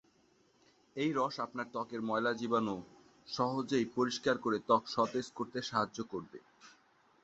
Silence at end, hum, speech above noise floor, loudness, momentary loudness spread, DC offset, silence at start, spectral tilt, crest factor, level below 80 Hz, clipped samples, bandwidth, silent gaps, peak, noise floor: 0.55 s; none; 35 dB; -35 LUFS; 12 LU; under 0.1%; 0.95 s; -3.5 dB/octave; 22 dB; -74 dBFS; under 0.1%; 8 kHz; none; -14 dBFS; -70 dBFS